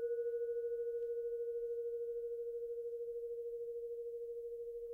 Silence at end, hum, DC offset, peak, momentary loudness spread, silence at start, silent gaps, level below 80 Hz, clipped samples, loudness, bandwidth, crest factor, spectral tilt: 0 s; none; under 0.1%; -32 dBFS; 6 LU; 0 s; none; -76 dBFS; under 0.1%; -43 LUFS; 1.6 kHz; 10 dB; -5.5 dB/octave